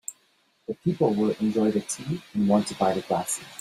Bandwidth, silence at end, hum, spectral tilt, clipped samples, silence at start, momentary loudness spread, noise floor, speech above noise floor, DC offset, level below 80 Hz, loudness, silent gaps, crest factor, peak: 15 kHz; 0 s; none; -5.5 dB/octave; under 0.1%; 0.1 s; 8 LU; -66 dBFS; 41 dB; under 0.1%; -64 dBFS; -26 LUFS; none; 18 dB; -8 dBFS